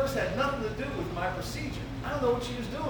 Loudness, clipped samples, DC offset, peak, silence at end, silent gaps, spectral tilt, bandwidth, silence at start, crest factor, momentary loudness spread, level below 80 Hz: -32 LUFS; under 0.1%; under 0.1%; -16 dBFS; 0 s; none; -5.5 dB/octave; over 20 kHz; 0 s; 16 dB; 7 LU; -44 dBFS